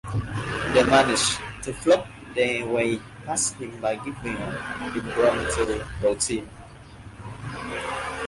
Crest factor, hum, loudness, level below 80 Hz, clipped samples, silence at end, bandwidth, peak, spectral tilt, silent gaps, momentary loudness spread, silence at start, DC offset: 20 dB; none; -25 LUFS; -44 dBFS; under 0.1%; 0 s; 11.5 kHz; -6 dBFS; -3.5 dB/octave; none; 15 LU; 0.05 s; under 0.1%